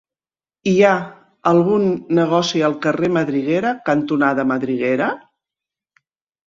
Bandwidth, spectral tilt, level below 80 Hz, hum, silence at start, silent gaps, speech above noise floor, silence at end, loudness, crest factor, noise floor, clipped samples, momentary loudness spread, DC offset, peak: 7.6 kHz; -6 dB/octave; -60 dBFS; none; 0.65 s; none; over 73 dB; 1.3 s; -18 LUFS; 16 dB; under -90 dBFS; under 0.1%; 8 LU; under 0.1%; -2 dBFS